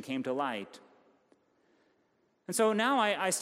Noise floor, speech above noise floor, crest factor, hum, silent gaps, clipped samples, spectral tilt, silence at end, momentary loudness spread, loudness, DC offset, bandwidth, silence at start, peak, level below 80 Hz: -73 dBFS; 42 dB; 20 dB; none; none; under 0.1%; -3 dB/octave; 0 s; 17 LU; -30 LUFS; under 0.1%; 15.5 kHz; 0 s; -14 dBFS; -88 dBFS